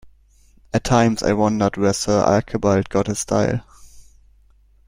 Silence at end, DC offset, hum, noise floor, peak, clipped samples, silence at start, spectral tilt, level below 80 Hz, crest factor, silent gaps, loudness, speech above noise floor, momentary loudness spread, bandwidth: 0.85 s; under 0.1%; none; -54 dBFS; 0 dBFS; under 0.1%; 0.05 s; -5.5 dB/octave; -44 dBFS; 20 dB; none; -19 LUFS; 35 dB; 6 LU; 16 kHz